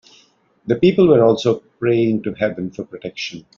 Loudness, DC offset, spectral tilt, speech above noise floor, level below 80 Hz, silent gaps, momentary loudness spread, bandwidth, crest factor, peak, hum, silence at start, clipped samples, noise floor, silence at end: -17 LUFS; under 0.1%; -6 dB/octave; 38 dB; -54 dBFS; none; 16 LU; 7.2 kHz; 16 dB; -2 dBFS; none; 0.65 s; under 0.1%; -55 dBFS; 0.15 s